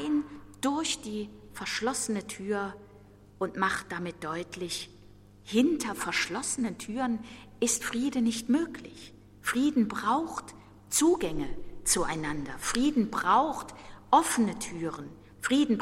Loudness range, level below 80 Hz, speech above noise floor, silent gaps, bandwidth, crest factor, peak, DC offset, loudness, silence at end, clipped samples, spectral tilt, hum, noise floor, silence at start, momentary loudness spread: 5 LU; -52 dBFS; 25 dB; none; 16.5 kHz; 22 dB; -8 dBFS; under 0.1%; -30 LUFS; 0 s; under 0.1%; -3 dB/octave; 50 Hz at -55 dBFS; -54 dBFS; 0 s; 15 LU